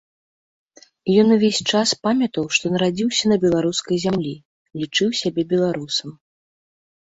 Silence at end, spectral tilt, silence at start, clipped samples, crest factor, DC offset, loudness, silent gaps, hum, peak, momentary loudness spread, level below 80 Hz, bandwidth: 0.95 s; -4.5 dB/octave; 1.05 s; under 0.1%; 16 dB; under 0.1%; -19 LUFS; 4.45-4.65 s; none; -4 dBFS; 12 LU; -58 dBFS; 8 kHz